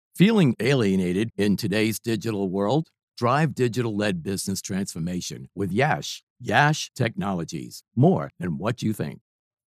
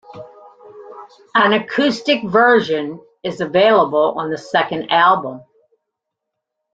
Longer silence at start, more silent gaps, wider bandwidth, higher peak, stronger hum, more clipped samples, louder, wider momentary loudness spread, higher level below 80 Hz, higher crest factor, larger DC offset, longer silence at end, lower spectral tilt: about the same, 0.15 s vs 0.1 s; first, 3.03-3.08 s, 6.23-6.36 s vs none; first, 15 kHz vs 8 kHz; about the same, -4 dBFS vs -2 dBFS; neither; neither; second, -24 LUFS vs -15 LUFS; second, 11 LU vs 14 LU; about the same, -60 dBFS vs -64 dBFS; about the same, 20 dB vs 16 dB; neither; second, 0.6 s vs 1.35 s; about the same, -5.5 dB/octave vs -5 dB/octave